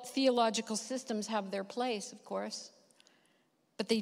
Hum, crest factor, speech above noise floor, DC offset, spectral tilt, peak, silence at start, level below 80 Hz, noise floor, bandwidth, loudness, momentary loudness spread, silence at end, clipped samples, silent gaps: none; 20 dB; 39 dB; under 0.1%; -3.5 dB/octave; -16 dBFS; 0 s; -86 dBFS; -74 dBFS; 16 kHz; -35 LUFS; 13 LU; 0 s; under 0.1%; none